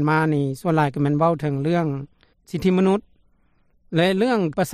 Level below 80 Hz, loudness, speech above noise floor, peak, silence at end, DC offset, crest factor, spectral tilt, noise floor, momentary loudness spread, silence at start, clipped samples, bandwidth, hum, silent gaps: -54 dBFS; -21 LUFS; 40 dB; -8 dBFS; 0 s; under 0.1%; 14 dB; -7 dB/octave; -60 dBFS; 8 LU; 0 s; under 0.1%; 14.5 kHz; none; none